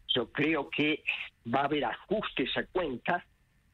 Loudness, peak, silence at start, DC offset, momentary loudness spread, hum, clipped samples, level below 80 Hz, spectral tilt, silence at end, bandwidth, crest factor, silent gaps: -31 LUFS; -12 dBFS; 0.1 s; under 0.1%; 5 LU; none; under 0.1%; -60 dBFS; -6.5 dB/octave; 0.5 s; 7.6 kHz; 20 dB; none